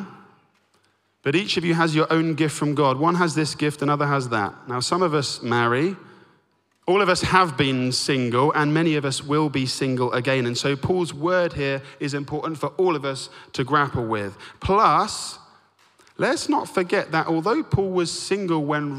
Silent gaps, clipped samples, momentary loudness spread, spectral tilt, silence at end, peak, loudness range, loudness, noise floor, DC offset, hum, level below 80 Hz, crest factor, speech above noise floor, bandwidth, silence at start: none; under 0.1%; 9 LU; -5 dB/octave; 0 s; -4 dBFS; 3 LU; -22 LUFS; -65 dBFS; under 0.1%; none; -52 dBFS; 20 dB; 43 dB; 15 kHz; 0 s